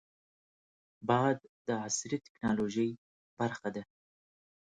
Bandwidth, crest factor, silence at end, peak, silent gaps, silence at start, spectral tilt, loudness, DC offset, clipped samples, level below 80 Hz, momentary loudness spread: 9.4 kHz; 22 dB; 0.95 s; -14 dBFS; 1.49-1.65 s, 2.29-2.35 s, 2.98-3.37 s; 1 s; -5 dB/octave; -34 LUFS; under 0.1%; under 0.1%; -70 dBFS; 11 LU